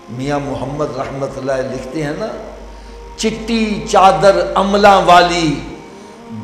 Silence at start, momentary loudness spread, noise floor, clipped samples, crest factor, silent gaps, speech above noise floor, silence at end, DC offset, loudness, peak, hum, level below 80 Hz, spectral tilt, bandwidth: 0 s; 21 LU; -35 dBFS; under 0.1%; 14 dB; none; 21 dB; 0 s; under 0.1%; -14 LUFS; 0 dBFS; none; -36 dBFS; -4.5 dB/octave; 15 kHz